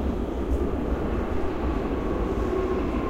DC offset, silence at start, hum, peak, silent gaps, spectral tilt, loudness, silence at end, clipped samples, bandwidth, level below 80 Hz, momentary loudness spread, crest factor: under 0.1%; 0 s; none; -14 dBFS; none; -8.5 dB/octave; -28 LUFS; 0 s; under 0.1%; 8.8 kHz; -30 dBFS; 2 LU; 12 dB